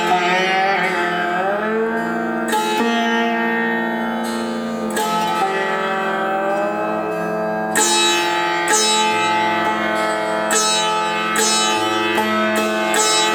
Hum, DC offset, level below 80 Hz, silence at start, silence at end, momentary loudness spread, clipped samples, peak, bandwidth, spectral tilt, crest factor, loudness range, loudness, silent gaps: none; under 0.1%; -62 dBFS; 0 s; 0 s; 7 LU; under 0.1%; -2 dBFS; over 20 kHz; -2 dB/octave; 16 dB; 4 LU; -17 LUFS; none